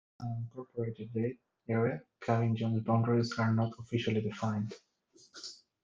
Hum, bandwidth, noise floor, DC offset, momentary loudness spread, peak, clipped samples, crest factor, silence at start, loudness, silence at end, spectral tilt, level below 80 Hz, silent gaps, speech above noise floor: none; 7.6 kHz; -61 dBFS; under 0.1%; 16 LU; -14 dBFS; under 0.1%; 18 dB; 0.2 s; -34 LUFS; 0.3 s; -7.5 dB/octave; -72 dBFS; none; 28 dB